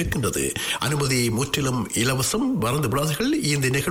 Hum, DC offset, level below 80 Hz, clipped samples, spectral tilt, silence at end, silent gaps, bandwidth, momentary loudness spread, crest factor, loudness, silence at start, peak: none; under 0.1%; -44 dBFS; under 0.1%; -4 dB/octave; 0 s; none; 19.5 kHz; 3 LU; 10 dB; -22 LUFS; 0 s; -12 dBFS